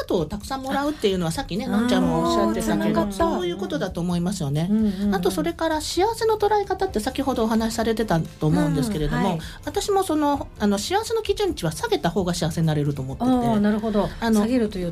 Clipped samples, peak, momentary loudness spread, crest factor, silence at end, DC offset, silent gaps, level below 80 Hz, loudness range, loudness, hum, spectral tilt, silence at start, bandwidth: under 0.1%; -8 dBFS; 5 LU; 14 dB; 0 s; under 0.1%; none; -40 dBFS; 1 LU; -23 LUFS; none; -5.5 dB/octave; 0 s; 15.5 kHz